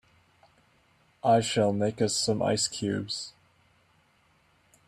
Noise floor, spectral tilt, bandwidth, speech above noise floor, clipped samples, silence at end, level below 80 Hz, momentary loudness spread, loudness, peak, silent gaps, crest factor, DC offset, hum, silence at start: -66 dBFS; -4 dB/octave; 14.5 kHz; 39 dB; under 0.1%; 1.55 s; -66 dBFS; 10 LU; -27 LUFS; -12 dBFS; none; 18 dB; under 0.1%; none; 1.25 s